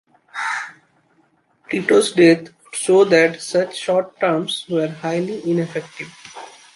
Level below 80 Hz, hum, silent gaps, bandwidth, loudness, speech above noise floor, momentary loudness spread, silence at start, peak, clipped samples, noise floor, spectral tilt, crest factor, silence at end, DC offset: -66 dBFS; none; none; 11.5 kHz; -18 LUFS; 43 dB; 20 LU; 0.35 s; -2 dBFS; under 0.1%; -60 dBFS; -4.5 dB/octave; 18 dB; 0.25 s; under 0.1%